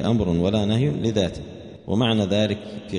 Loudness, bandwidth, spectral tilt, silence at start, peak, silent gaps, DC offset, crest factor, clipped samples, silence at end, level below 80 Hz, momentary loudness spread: -22 LUFS; 10.5 kHz; -6.5 dB/octave; 0 s; -6 dBFS; none; under 0.1%; 16 dB; under 0.1%; 0 s; -44 dBFS; 13 LU